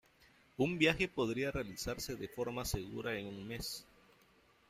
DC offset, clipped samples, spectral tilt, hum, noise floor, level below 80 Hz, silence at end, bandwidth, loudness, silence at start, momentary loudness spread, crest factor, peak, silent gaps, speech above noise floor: under 0.1%; under 0.1%; -4.5 dB/octave; none; -68 dBFS; -56 dBFS; 0.85 s; 16 kHz; -38 LUFS; 0.6 s; 12 LU; 24 dB; -16 dBFS; none; 31 dB